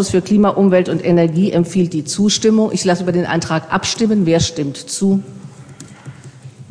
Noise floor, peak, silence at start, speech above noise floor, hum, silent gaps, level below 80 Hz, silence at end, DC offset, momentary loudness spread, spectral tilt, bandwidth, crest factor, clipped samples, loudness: -37 dBFS; -2 dBFS; 0 s; 22 dB; none; none; -46 dBFS; 0.05 s; under 0.1%; 14 LU; -5.5 dB/octave; 10.5 kHz; 14 dB; under 0.1%; -15 LUFS